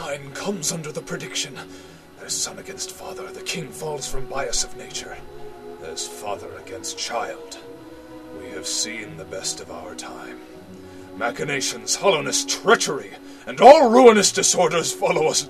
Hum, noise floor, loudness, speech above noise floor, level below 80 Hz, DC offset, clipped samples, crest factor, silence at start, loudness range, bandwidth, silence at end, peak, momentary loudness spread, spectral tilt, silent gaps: none; -40 dBFS; -20 LUFS; 19 dB; -46 dBFS; 0.2%; under 0.1%; 22 dB; 0 s; 15 LU; 14 kHz; 0 s; 0 dBFS; 25 LU; -2.5 dB/octave; none